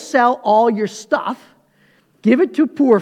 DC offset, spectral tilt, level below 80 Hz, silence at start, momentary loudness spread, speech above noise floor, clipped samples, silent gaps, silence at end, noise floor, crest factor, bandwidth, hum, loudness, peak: under 0.1%; -6 dB/octave; -74 dBFS; 0 s; 9 LU; 41 dB; under 0.1%; none; 0 s; -56 dBFS; 16 dB; 12.5 kHz; none; -16 LUFS; 0 dBFS